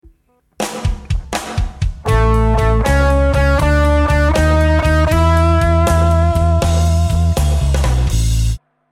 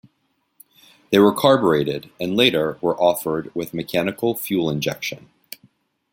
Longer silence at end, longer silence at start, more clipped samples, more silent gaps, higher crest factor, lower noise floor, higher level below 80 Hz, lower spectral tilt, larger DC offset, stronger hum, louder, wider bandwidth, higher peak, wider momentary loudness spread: second, 0.35 s vs 0.95 s; second, 0.6 s vs 1.1 s; neither; neither; second, 12 dB vs 20 dB; second, -55 dBFS vs -69 dBFS; first, -16 dBFS vs -58 dBFS; about the same, -6 dB/octave vs -5 dB/octave; neither; neither; first, -15 LUFS vs -20 LUFS; second, 14.5 kHz vs 17 kHz; about the same, -2 dBFS vs -2 dBFS; second, 9 LU vs 17 LU